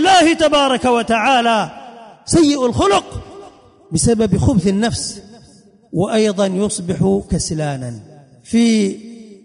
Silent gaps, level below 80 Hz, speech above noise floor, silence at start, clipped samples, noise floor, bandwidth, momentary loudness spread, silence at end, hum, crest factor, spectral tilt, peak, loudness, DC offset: none; -36 dBFS; 31 dB; 0 s; under 0.1%; -47 dBFS; 11 kHz; 17 LU; 0.1 s; none; 14 dB; -4.5 dB/octave; -2 dBFS; -16 LUFS; under 0.1%